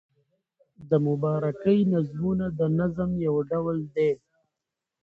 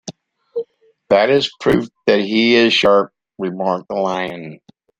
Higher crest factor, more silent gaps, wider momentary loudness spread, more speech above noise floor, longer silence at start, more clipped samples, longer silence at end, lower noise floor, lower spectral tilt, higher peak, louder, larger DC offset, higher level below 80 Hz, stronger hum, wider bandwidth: about the same, 16 dB vs 16 dB; neither; second, 5 LU vs 17 LU; first, 62 dB vs 22 dB; first, 0.8 s vs 0.05 s; neither; first, 0.85 s vs 0.45 s; first, -86 dBFS vs -38 dBFS; first, -10.5 dB/octave vs -5 dB/octave; second, -10 dBFS vs -2 dBFS; second, -26 LUFS vs -16 LUFS; neither; about the same, -56 dBFS vs -52 dBFS; neither; second, 4.6 kHz vs 9.8 kHz